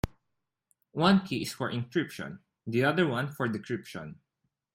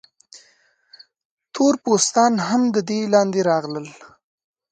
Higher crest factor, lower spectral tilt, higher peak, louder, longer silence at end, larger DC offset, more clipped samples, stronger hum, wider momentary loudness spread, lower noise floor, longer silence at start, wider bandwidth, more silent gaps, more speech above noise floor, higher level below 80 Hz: about the same, 22 dB vs 20 dB; first, -6 dB/octave vs -4 dB/octave; second, -10 dBFS vs -2 dBFS; second, -29 LUFS vs -19 LUFS; about the same, 0.6 s vs 0.65 s; neither; neither; neither; first, 18 LU vs 14 LU; first, -84 dBFS vs -60 dBFS; second, 0.05 s vs 0.35 s; first, 16.5 kHz vs 9.4 kHz; second, none vs 1.25-1.37 s; first, 55 dB vs 41 dB; first, -54 dBFS vs -70 dBFS